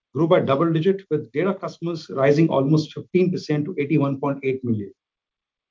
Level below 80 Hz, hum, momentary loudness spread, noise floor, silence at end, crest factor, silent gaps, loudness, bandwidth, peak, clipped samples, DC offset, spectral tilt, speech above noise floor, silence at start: -66 dBFS; none; 10 LU; -88 dBFS; 0.8 s; 18 dB; none; -22 LUFS; 7.6 kHz; -4 dBFS; under 0.1%; under 0.1%; -8 dB/octave; 67 dB; 0.15 s